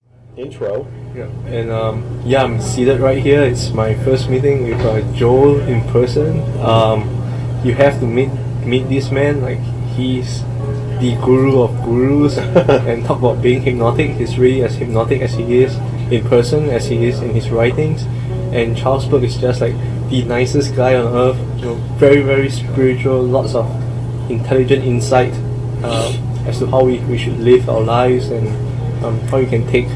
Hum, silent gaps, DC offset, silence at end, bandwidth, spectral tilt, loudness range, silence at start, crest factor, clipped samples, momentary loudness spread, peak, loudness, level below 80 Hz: none; none; under 0.1%; 0 s; 11 kHz; -7.5 dB/octave; 3 LU; 0.3 s; 14 dB; under 0.1%; 9 LU; 0 dBFS; -15 LUFS; -32 dBFS